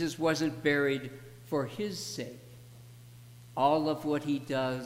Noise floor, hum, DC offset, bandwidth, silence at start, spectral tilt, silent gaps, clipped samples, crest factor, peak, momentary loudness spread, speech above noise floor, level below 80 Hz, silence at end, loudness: -51 dBFS; 60 Hz at -50 dBFS; under 0.1%; 16 kHz; 0 s; -5 dB/octave; none; under 0.1%; 20 dB; -12 dBFS; 24 LU; 21 dB; -68 dBFS; 0 s; -31 LUFS